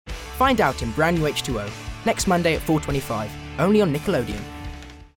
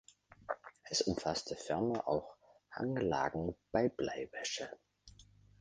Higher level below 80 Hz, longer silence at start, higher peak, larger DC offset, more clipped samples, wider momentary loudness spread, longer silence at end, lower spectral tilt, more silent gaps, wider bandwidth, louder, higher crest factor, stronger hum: first, -38 dBFS vs -62 dBFS; second, 0.05 s vs 0.5 s; first, -6 dBFS vs -16 dBFS; neither; neither; about the same, 14 LU vs 12 LU; second, 0.1 s vs 0.4 s; about the same, -5 dB/octave vs -4.5 dB/octave; neither; first, 18 kHz vs 10 kHz; first, -22 LUFS vs -38 LUFS; about the same, 18 dB vs 22 dB; neither